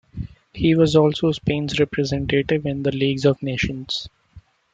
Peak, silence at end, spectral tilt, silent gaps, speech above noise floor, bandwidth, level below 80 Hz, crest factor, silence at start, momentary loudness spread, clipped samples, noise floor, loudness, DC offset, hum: -4 dBFS; 0.35 s; -6.5 dB/octave; none; 29 dB; 9 kHz; -44 dBFS; 18 dB; 0.15 s; 11 LU; under 0.1%; -49 dBFS; -20 LUFS; under 0.1%; none